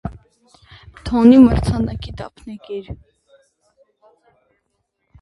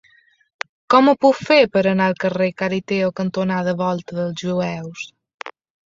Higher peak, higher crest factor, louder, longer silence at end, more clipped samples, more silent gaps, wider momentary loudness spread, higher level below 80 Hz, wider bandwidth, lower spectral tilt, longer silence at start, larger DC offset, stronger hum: about the same, 0 dBFS vs -2 dBFS; about the same, 18 dB vs 18 dB; first, -13 LUFS vs -18 LUFS; first, 2.25 s vs 0.45 s; neither; second, none vs 5.34-5.38 s; first, 26 LU vs 19 LU; first, -34 dBFS vs -60 dBFS; first, 11.5 kHz vs 7.6 kHz; first, -8 dB/octave vs -6.5 dB/octave; second, 0.05 s vs 0.9 s; neither; neither